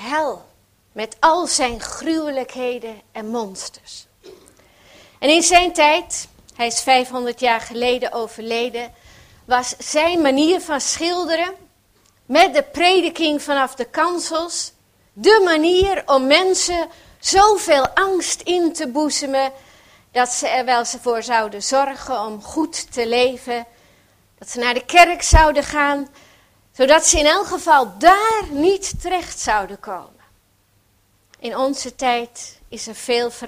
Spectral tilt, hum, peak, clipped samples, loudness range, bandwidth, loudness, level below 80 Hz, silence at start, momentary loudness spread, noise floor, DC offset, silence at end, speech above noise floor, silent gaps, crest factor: -2.5 dB/octave; none; 0 dBFS; under 0.1%; 8 LU; 16 kHz; -17 LUFS; -34 dBFS; 0 s; 16 LU; -60 dBFS; under 0.1%; 0 s; 42 dB; none; 18 dB